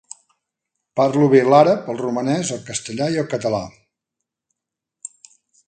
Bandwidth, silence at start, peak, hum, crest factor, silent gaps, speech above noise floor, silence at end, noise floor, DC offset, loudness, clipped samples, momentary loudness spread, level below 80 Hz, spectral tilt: 9.6 kHz; 0.95 s; 0 dBFS; none; 20 dB; none; 67 dB; 2 s; -84 dBFS; under 0.1%; -18 LUFS; under 0.1%; 24 LU; -60 dBFS; -5.5 dB/octave